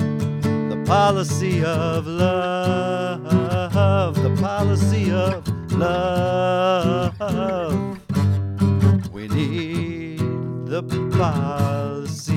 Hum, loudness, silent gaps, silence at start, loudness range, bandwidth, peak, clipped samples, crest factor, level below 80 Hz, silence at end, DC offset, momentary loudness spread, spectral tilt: none; -21 LUFS; none; 0 s; 2 LU; 14.5 kHz; -4 dBFS; under 0.1%; 16 dB; -46 dBFS; 0 s; under 0.1%; 7 LU; -7 dB/octave